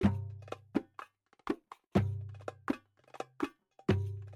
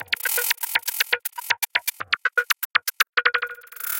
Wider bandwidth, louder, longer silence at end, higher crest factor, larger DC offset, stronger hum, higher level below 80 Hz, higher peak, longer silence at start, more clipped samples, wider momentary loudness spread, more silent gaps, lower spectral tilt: second, 10 kHz vs 17.5 kHz; second, -38 LUFS vs -22 LUFS; about the same, 0 s vs 0 s; about the same, 22 dB vs 22 dB; neither; neither; first, -58 dBFS vs -74 dBFS; second, -16 dBFS vs -4 dBFS; about the same, 0 s vs 0 s; neither; first, 16 LU vs 5 LU; second, none vs 2.65-2.74 s, 3.09-3.13 s; first, -8 dB/octave vs 2.5 dB/octave